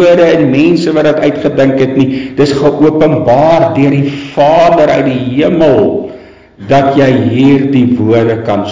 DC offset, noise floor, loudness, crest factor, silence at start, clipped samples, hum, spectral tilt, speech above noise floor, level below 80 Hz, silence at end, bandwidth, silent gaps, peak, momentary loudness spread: 0.7%; -31 dBFS; -8 LUFS; 8 dB; 0 s; under 0.1%; none; -7.5 dB/octave; 24 dB; -40 dBFS; 0 s; 7.6 kHz; none; 0 dBFS; 5 LU